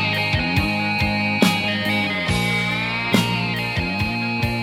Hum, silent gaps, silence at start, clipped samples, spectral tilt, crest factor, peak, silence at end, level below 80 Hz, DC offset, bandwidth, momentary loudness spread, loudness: none; none; 0 s; under 0.1%; -5 dB/octave; 20 dB; 0 dBFS; 0 s; -40 dBFS; under 0.1%; 17.5 kHz; 4 LU; -20 LUFS